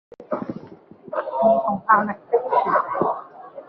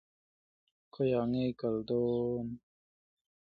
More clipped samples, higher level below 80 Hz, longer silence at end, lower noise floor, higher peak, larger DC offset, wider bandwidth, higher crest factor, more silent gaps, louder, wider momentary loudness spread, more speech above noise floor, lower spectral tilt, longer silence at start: neither; about the same, -66 dBFS vs -66 dBFS; second, 0.05 s vs 0.8 s; second, -44 dBFS vs under -90 dBFS; first, -2 dBFS vs -20 dBFS; neither; first, 5.4 kHz vs 4.8 kHz; about the same, 20 dB vs 16 dB; neither; first, -21 LUFS vs -33 LUFS; first, 14 LU vs 9 LU; second, 25 dB vs over 58 dB; second, -5.5 dB/octave vs -10.5 dB/octave; second, 0.2 s vs 0.95 s